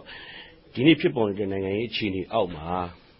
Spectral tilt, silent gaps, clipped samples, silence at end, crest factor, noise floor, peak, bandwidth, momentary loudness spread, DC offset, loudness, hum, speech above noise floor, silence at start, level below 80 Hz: -10.5 dB/octave; none; under 0.1%; 0.25 s; 20 dB; -46 dBFS; -6 dBFS; 5.8 kHz; 20 LU; under 0.1%; -25 LUFS; none; 21 dB; 0 s; -50 dBFS